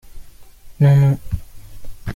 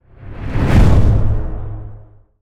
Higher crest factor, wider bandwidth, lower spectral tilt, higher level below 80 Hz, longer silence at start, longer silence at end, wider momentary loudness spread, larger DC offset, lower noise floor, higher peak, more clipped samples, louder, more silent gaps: about the same, 14 dB vs 14 dB; second, 7 kHz vs 9.6 kHz; about the same, -9 dB/octave vs -8 dB/octave; second, -36 dBFS vs -18 dBFS; second, 0.05 s vs 0.2 s; second, 0 s vs 0.4 s; second, 17 LU vs 21 LU; neither; about the same, -39 dBFS vs -38 dBFS; second, -4 dBFS vs 0 dBFS; neither; about the same, -15 LUFS vs -15 LUFS; neither